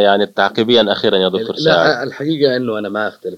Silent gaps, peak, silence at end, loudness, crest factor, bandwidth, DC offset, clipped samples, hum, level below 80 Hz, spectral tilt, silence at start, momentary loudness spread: none; 0 dBFS; 0 s; -15 LUFS; 14 dB; 14 kHz; under 0.1%; under 0.1%; none; -58 dBFS; -5.5 dB/octave; 0 s; 8 LU